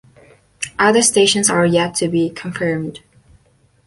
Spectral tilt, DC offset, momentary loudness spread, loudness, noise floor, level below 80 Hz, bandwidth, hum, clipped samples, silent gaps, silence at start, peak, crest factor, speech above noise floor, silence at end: -3.5 dB/octave; under 0.1%; 14 LU; -15 LUFS; -56 dBFS; -52 dBFS; 11.5 kHz; none; under 0.1%; none; 0.6 s; -2 dBFS; 16 dB; 40 dB; 0.9 s